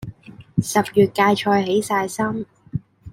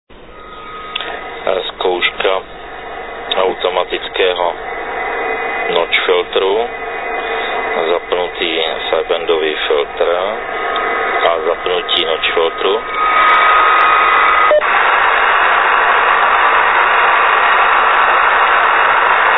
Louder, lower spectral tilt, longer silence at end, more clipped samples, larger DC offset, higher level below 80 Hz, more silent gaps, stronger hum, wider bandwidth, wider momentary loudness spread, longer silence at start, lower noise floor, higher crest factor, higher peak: second, -20 LUFS vs -13 LUFS; about the same, -5 dB/octave vs -5 dB/octave; about the same, 0 s vs 0 s; neither; second, under 0.1% vs 0.8%; second, -52 dBFS vs -44 dBFS; neither; neither; first, 16.5 kHz vs 5.4 kHz; first, 15 LU vs 11 LU; about the same, 0 s vs 0.1 s; first, -40 dBFS vs -34 dBFS; about the same, 18 dB vs 14 dB; second, -4 dBFS vs 0 dBFS